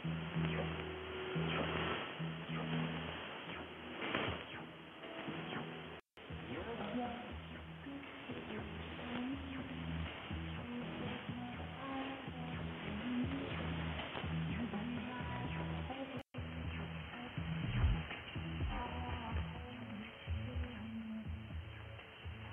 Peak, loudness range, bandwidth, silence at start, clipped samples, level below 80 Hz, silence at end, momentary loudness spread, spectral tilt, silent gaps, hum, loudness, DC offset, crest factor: -22 dBFS; 5 LU; 4 kHz; 0 s; under 0.1%; -52 dBFS; 0 s; 10 LU; -8.5 dB/octave; none; none; -43 LUFS; under 0.1%; 22 dB